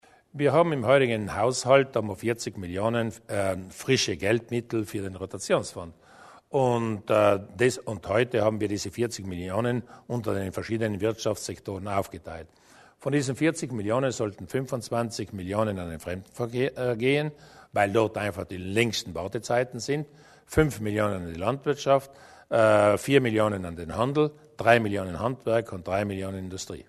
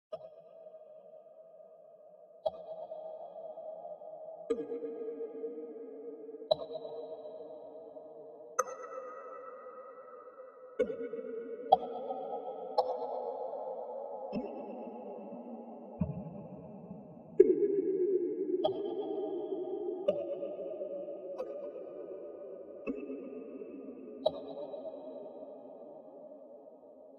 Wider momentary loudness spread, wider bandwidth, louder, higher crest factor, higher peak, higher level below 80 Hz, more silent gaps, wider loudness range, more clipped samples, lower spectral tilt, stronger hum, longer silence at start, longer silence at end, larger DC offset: second, 12 LU vs 19 LU; first, 13.5 kHz vs 7 kHz; first, -27 LUFS vs -38 LUFS; second, 22 dB vs 30 dB; first, -4 dBFS vs -8 dBFS; first, -54 dBFS vs -72 dBFS; neither; second, 5 LU vs 11 LU; neither; about the same, -5.5 dB/octave vs -5.5 dB/octave; neither; first, 0.35 s vs 0.1 s; about the same, 0.05 s vs 0 s; neither